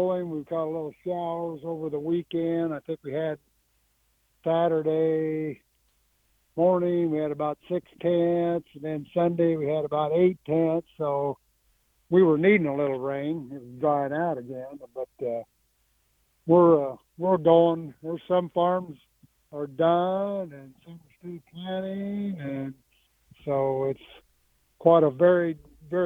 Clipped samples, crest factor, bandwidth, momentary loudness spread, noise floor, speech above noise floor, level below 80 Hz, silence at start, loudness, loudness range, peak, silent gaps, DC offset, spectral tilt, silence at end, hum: under 0.1%; 22 dB; 3.9 kHz; 18 LU; -69 dBFS; 44 dB; -66 dBFS; 0 s; -26 LUFS; 7 LU; -4 dBFS; none; under 0.1%; -9.5 dB/octave; 0 s; none